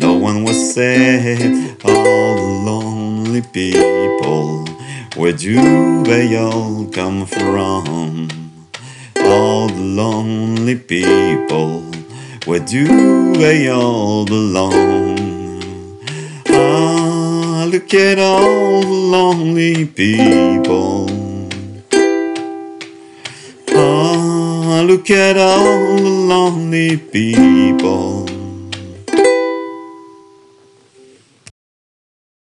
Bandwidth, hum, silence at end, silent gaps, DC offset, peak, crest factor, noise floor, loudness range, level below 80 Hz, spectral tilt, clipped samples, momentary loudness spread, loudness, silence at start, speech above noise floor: 11.5 kHz; none; 2.4 s; none; under 0.1%; 0 dBFS; 12 dB; -47 dBFS; 5 LU; -52 dBFS; -5.5 dB/octave; under 0.1%; 16 LU; -13 LUFS; 0 s; 35 dB